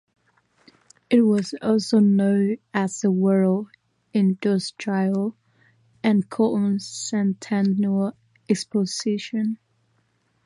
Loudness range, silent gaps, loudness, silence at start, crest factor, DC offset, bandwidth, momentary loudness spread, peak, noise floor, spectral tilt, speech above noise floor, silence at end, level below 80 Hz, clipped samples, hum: 4 LU; none; -22 LUFS; 1.1 s; 16 dB; under 0.1%; 11.5 kHz; 9 LU; -6 dBFS; -67 dBFS; -6.5 dB/octave; 46 dB; 0.9 s; -70 dBFS; under 0.1%; none